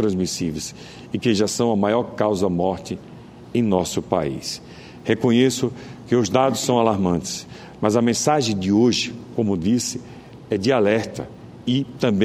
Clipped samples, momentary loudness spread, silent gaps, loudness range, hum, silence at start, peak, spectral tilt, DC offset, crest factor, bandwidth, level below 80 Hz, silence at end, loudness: under 0.1%; 15 LU; none; 3 LU; none; 0 s; -2 dBFS; -5 dB/octave; under 0.1%; 20 dB; 15 kHz; -52 dBFS; 0 s; -21 LUFS